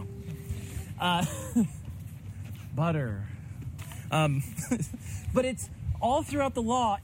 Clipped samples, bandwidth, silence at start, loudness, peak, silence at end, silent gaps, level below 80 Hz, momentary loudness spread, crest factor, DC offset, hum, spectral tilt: under 0.1%; 16 kHz; 0 s; -31 LUFS; -12 dBFS; 0 s; none; -48 dBFS; 14 LU; 18 dB; under 0.1%; none; -5.5 dB/octave